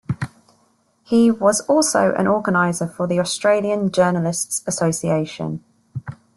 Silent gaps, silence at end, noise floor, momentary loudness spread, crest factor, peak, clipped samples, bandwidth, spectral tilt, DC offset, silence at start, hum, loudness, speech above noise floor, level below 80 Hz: none; 0.2 s; -61 dBFS; 15 LU; 16 dB; -4 dBFS; under 0.1%; 12.5 kHz; -5 dB/octave; under 0.1%; 0.1 s; none; -19 LUFS; 43 dB; -58 dBFS